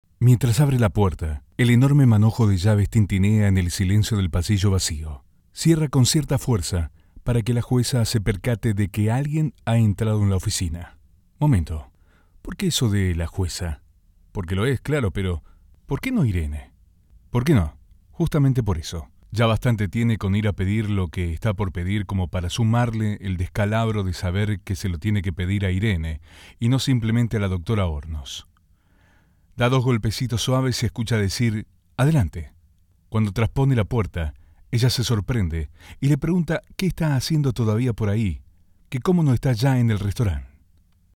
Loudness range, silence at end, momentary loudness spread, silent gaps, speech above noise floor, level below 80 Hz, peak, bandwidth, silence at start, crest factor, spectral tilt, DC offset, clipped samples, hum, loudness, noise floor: 6 LU; 0.7 s; 12 LU; none; 38 dB; -38 dBFS; -6 dBFS; 16.5 kHz; 0.2 s; 16 dB; -6 dB/octave; under 0.1%; under 0.1%; none; -22 LUFS; -59 dBFS